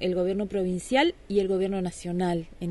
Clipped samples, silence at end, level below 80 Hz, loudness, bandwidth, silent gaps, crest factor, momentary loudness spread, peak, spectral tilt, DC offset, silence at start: under 0.1%; 0 s; -50 dBFS; -27 LUFS; 11.5 kHz; none; 16 dB; 6 LU; -10 dBFS; -6 dB/octave; under 0.1%; 0 s